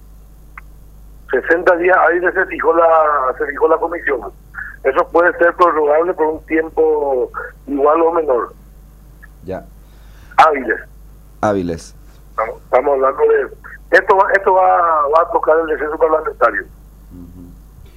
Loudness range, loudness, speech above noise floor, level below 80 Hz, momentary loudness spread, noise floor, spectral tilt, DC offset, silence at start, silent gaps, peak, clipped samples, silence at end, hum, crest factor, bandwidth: 5 LU; -14 LUFS; 26 dB; -42 dBFS; 13 LU; -40 dBFS; -6 dB/octave; under 0.1%; 1 s; none; 0 dBFS; under 0.1%; 0.35 s; 50 Hz at -40 dBFS; 16 dB; 14.5 kHz